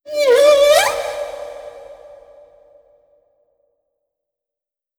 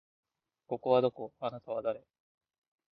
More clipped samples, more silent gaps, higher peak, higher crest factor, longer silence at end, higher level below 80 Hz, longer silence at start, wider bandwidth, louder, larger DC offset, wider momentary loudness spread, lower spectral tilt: neither; neither; first, -2 dBFS vs -14 dBFS; about the same, 18 dB vs 22 dB; first, 3.05 s vs 0.95 s; first, -56 dBFS vs -76 dBFS; second, 0.05 s vs 0.7 s; first, over 20 kHz vs 5 kHz; first, -13 LUFS vs -33 LUFS; neither; first, 23 LU vs 13 LU; second, -0.5 dB/octave vs -9.5 dB/octave